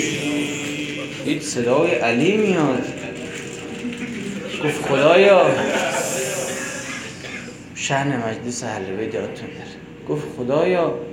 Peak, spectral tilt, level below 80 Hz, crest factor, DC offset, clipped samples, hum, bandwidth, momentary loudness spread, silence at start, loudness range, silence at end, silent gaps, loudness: -2 dBFS; -4.5 dB/octave; -56 dBFS; 20 dB; under 0.1%; under 0.1%; none; 17 kHz; 15 LU; 0 s; 7 LU; 0 s; none; -21 LUFS